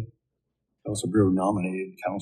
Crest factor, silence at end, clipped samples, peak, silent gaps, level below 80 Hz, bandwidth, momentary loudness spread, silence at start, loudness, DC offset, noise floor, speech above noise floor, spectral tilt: 18 dB; 0 s; under 0.1%; -10 dBFS; none; -56 dBFS; 12 kHz; 16 LU; 0 s; -26 LUFS; under 0.1%; -81 dBFS; 56 dB; -6.5 dB/octave